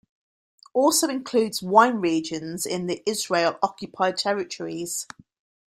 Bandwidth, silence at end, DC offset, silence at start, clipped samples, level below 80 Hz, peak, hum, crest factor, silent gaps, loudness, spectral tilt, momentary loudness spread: 16 kHz; 0.65 s; under 0.1%; 0.75 s; under 0.1%; -68 dBFS; -2 dBFS; none; 22 dB; none; -24 LUFS; -3 dB/octave; 12 LU